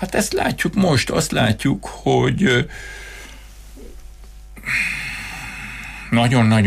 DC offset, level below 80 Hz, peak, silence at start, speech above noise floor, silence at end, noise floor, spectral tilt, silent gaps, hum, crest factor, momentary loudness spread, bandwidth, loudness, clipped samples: under 0.1%; -38 dBFS; -6 dBFS; 0 s; 21 dB; 0 s; -39 dBFS; -5 dB/octave; none; 50 Hz at -40 dBFS; 14 dB; 17 LU; 15.5 kHz; -19 LUFS; under 0.1%